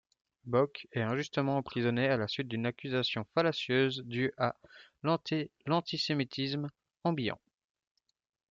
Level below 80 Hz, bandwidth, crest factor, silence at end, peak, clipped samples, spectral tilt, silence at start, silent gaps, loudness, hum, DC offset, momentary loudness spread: -72 dBFS; 7.6 kHz; 18 dB; 1.15 s; -14 dBFS; under 0.1%; -6.5 dB/octave; 0.45 s; none; -33 LUFS; none; under 0.1%; 7 LU